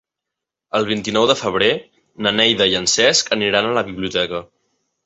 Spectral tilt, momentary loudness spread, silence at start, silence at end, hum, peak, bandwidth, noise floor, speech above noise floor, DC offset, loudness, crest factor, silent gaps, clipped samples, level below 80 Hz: -2.5 dB/octave; 9 LU; 0.75 s; 0.6 s; none; 0 dBFS; 8.4 kHz; -83 dBFS; 66 dB; under 0.1%; -17 LUFS; 18 dB; none; under 0.1%; -52 dBFS